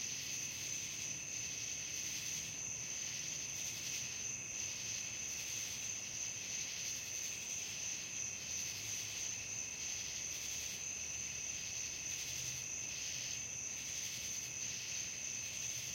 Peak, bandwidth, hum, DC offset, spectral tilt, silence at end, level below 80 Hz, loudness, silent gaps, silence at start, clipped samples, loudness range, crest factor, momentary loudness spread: -28 dBFS; 16.5 kHz; none; under 0.1%; 0 dB/octave; 0 s; -70 dBFS; -40 LUFS; none; 0 s; under 0.1%; 0 LU; 14 dB; 1 LU